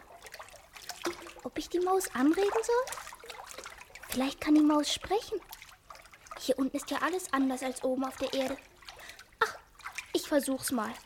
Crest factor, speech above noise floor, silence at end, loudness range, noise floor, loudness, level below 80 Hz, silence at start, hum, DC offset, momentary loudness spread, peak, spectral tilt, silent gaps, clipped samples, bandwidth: 20 dB; 23 dB; 0.05 s; 4 LU; -53 dBFS; -31 LUFS; -62 dBFS; 0 s; none; under 0.1%; 21 LU; -12 dBFS; -3 dB/octave; none; under 0.1%; 17 kHz